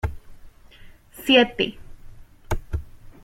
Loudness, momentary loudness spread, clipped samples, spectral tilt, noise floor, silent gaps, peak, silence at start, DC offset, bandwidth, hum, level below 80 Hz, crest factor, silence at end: -22 LUFS; 17 LU; under 0.1%; -5 dB/octave; -46 dBFS; none; -4 dBFS; 0.05 s; under 0.1%; 16.5 kHz; none; -38 dBFS; 22 dB; 0.15 s